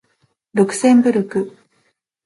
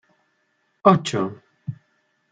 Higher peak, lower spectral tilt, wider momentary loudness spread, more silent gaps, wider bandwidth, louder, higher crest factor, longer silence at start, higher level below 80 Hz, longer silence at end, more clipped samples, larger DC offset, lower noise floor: about the same, -2 dBFS vs 0 dBFS; about the same, -6 dB/octave vs -6.5 dB/octave; second, 11 LU vs 19 LU; neither; first, 11.5 kHz vs 9.4 kHz; first, -16 LUFS vs -20 LUFS; second, 16 dB vs 24 dB; second, 0.55 s vs 0.85 s; about the same, -66 dBFS vs -66 dBFS; first, 0.75 s vs 0.6 s; neither; neither; second, -65 dBFS vs -69 dBFS